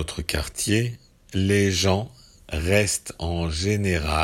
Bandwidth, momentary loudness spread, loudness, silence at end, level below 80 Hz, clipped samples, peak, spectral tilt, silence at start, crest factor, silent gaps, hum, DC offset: 16.5 kHz; 11 LU; -24 LUFS; 0 s; -38 dBFS; under 0.1%; -4 dBFS; -4.5 dB/octave; 0 s; 20 dB; none; none; under 0.1%